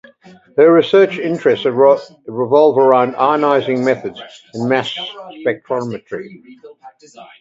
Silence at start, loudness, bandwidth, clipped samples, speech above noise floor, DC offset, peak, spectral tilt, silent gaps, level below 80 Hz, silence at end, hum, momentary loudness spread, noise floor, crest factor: 0.55 s; -14 LUFS; 7.8 kHz; under 0.1%; 30 dB; under 0.1%; 0 dBFS; -6.5 dB/octave; none; -64 dBFS; 0.2 s; none; 17 LU; -45 dBFS; 16 dB